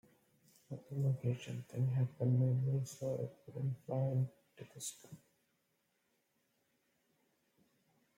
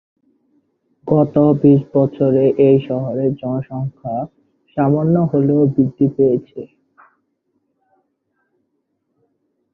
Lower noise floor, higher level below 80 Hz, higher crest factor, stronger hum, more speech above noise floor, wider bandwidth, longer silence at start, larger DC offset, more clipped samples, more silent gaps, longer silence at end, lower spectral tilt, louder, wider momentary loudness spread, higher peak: first, -81 dBFS vs -70 dBFS; second, -80 dBFS vs -54 dBFS; about the same, 16 dB vs 16 dB; neither; second, 44 dB vs 55 dB; first, 15.5 kHz vs 3.8 kHz; second, 0.7 s vs 1.05 s; neither; neither; neither; about the same, 3 s vs 3.1 s; second, -7.5 dB/octave vs -12 dB/octave; second, -38 LUFS vs -16 LUFS; first, 18 LU vs 14 LU; second, -24 dBFS vs -2 dBFS